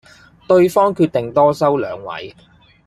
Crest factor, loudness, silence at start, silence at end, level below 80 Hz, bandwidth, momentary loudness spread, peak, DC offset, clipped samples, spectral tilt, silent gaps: 16 dB; -15 LUFS; 0.5 s; 0.55 s; -56 dBFS; 14.5 kHz; 16 LU; -2 dBFS; under 0.1%; under 0.1%; -7 dB/octave; none